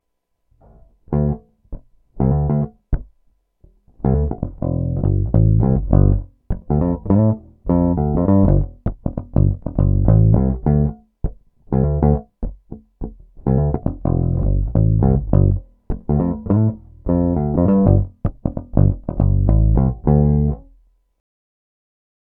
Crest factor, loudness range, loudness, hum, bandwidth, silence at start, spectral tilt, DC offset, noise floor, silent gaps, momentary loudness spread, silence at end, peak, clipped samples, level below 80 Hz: 18 dB; 5 LU; -18 LUFS; none; 2.2 kHz; 1.1 s; -15.5 dB/octave; under 0.1%; -70 dBFS; none; 13 LU; 1.65 s; 0 dBFS; under 0.1%; -24 dBFS